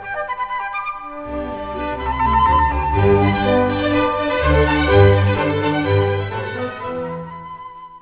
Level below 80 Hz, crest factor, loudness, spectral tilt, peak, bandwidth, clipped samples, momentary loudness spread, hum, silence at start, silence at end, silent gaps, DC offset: -28 dBFS; 18 dB; -18 LUFS; -11 dB/octave; 0 dBFS; 4 kHz; under 0.1%; 14 LU; none; 0 s; 0.05 s; none; under 0.1%